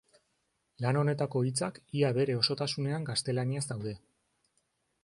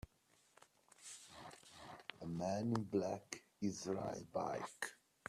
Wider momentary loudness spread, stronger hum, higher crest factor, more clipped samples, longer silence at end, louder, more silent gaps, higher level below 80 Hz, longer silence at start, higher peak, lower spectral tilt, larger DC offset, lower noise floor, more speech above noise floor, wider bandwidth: second, 8 LU vs 17 LU; neither; about the same, 22 dB vs 22 dB; neither; first, 1.05 s vs 0 s; first, -31 LUFS vs -44 LUFS; neither; first, -68 dBFS vs -74 dBFS; second, 0.8 s vs 1 s; first, -12 dBFS vs -24 dBFS; about the same, -5 dB/octave vs -5.5 dB/octave; neither; about the same, -78 dBFS vs -75 dBFS; first, 47 dB vs 33 dB; second, 11.5 kHz vs 14 kHz